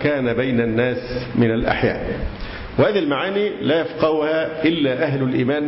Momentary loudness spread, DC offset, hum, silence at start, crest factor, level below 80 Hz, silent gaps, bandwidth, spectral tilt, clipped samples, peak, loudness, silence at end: 8 LU; under 0.1%; none; 0 s; 14 dB; -38 dBFS; none; 5.8 kHz; -11 dB/octave; under 0.1%; -6 dBFS; -20 LUFS; 0 s